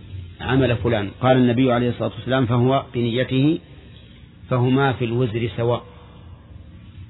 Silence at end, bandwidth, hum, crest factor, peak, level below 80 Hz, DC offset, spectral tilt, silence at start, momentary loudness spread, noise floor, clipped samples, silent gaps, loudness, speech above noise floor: 0.05 s; 4.1 kHz; none; 16 dB; -4 dBFS; -46 dBFS; under 0.1%; -11 dB/octave; 0 s; 8 LU; -44 dBFS; under 0.1%; none; -20 LUFS; 25 dB